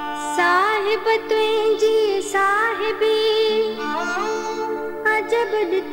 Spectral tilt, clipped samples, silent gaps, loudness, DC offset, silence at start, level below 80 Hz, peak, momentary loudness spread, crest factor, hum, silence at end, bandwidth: -2 dB/octave; under 0.1%; none; -20 LUFS; under 0.1%; 0 s; -58 dBFS; -8 dBFS; 7 LU; 12 dB; 50 Hz at -60 dBFS; 0 s; 16.5 kHz